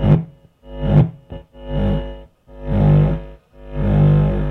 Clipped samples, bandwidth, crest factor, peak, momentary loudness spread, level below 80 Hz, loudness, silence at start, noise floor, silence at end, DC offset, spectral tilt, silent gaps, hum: under 0.1%; 3.9 kHz; 16 dB; -2 dBFS; 21 LU; -26 dBFS; -17 LUFS; 0 s; -40 dBFS; 0 s; under 0.1%; -11 dB/octave; none; none